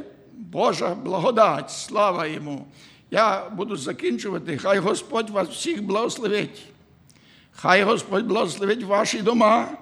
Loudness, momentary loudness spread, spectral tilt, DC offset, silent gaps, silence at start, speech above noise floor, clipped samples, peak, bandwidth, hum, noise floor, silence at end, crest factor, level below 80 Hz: -22 LUFS; 11 LU; -4.5 dB/octave; under 0.1%; none; 0 s; 32 dB; under 0.1%; -4 dBFS; 13 kHz; none; -54 dBFS; 0 s; 20 dB; -68 dBFS